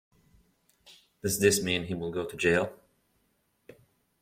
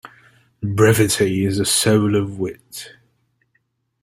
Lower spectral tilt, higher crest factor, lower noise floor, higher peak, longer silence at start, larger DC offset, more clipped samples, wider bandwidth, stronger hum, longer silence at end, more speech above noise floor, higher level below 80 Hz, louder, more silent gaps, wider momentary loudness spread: about the same, -3.5 dB/octave vs -4.5 dB/octave; first, 24 dB vs 18 dB; first, -73 dBFS vs -68 dBFS; second, -8 dBFS vs -2 dBFS; first, 0.9 s vs 0.05 s; neither; neither; about the same, 16.5 kHz vs 16 kHz; neither; first, 1.45 s vs 1.15 s; second, 45 dB vs 50 dB; second, -62 dBFS vs -52 dBFS; second, -28 LUFS vs -17 LUFS; neither; second, 11 LU vs 19 LU